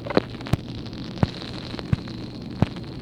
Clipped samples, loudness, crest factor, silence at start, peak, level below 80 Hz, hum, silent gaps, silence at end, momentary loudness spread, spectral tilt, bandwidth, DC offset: under 0.1%; -29 LUFS; 26 dB; 0 s; 0 dBFS; -42 dBFS; none; none; 0 s; 9 LU; -7 dB/octave; 15 kHz; under 0.1%